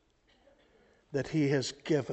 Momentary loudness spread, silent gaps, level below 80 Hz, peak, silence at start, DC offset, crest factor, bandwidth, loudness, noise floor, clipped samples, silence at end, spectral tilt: 8 LU; none; -66 dBFS; -16 dBFS; 1.1 s; under 0.1%; 18 dB; 8.2 kHz; -32 LUFS; -67 dBFS; under 0.1%; 0 s; -6 dB/octave